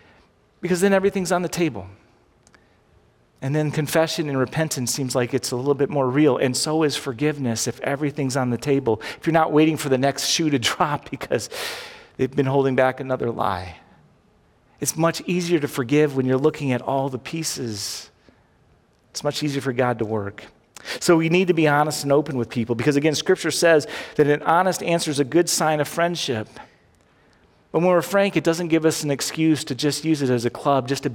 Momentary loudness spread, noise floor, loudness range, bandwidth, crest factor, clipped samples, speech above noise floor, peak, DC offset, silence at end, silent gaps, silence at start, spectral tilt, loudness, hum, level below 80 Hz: 9 LU; -58 dBFS; 6 LU; 17.5 kHz; 18 dB; under 0.1%; 37 dB; -4 dBFS; under 0.1%; 0 s; none; 0.6 s; -4.5 dB/octave; -21 LUFS; none; -60 dBFS